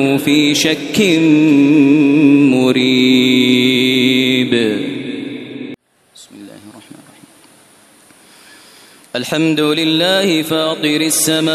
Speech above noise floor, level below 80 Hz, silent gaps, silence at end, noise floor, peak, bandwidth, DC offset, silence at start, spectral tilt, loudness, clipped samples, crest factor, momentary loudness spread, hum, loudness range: 35 dB; -60 dBFS; none; 0 s; -46 dBFS; 0 dBFS; 14 kHz; under 0.1%; 0 s; -4 dB/octave; -12 LUFS; under 0.1%; 14 dB; 14 LU; none; 18 LU